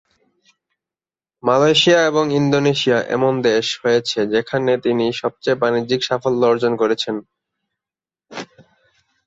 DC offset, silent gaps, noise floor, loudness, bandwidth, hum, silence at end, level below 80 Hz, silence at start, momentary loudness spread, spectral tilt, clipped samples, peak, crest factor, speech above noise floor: under 0.1%; none; under -90 dBFS; -17 LUFS; 8 kHz; none; 0.85 s; -60 dBFS; 1.45 s; 11 LU; -4.5 dB/octave; under 0.1%; -2 dBFS; 16 dB; over 73 dB